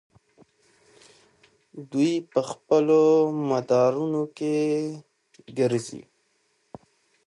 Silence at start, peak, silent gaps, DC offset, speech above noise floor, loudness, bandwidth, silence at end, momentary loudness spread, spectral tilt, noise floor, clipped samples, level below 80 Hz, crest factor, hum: 1.75 s; -8 dBFS; none; under 0.1%; 46 dB; -24 LUFS; 11.5 kHz; 1.25 s; 18 LU; -6.5 dB/octave; -69 dBFS; under 0.1%; -74 dBFS; 18 dB; none